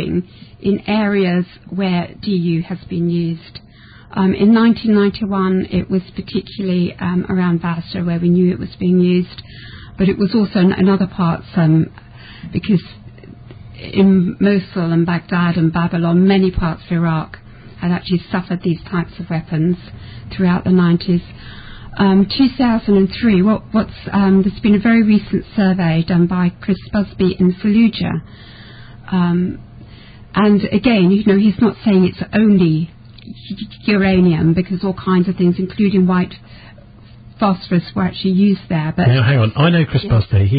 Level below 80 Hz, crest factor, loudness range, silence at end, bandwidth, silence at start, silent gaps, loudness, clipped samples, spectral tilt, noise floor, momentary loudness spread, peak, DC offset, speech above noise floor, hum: -38 dBFS; 14 dB; 4 LU; 0 s; 5 kHz; 0 s; none; -16 LUFS; under 0.1%; -13 dB/octave; -40 dBFS; 11 LU; -2 dBFS; under 0.1%; 25 dB; none